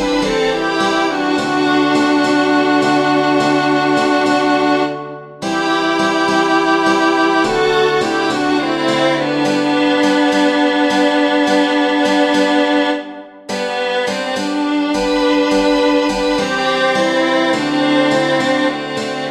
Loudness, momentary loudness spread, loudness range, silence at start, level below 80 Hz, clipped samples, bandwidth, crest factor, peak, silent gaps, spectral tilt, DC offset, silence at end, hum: -14 LUFS; 5 LU; 2 LU; 0 s; -46 dBFS; under 0.1%; 12 kHz; 12 dB; -2 dBFS; none; -4 dB/octave; under 0.1%; 0 s; none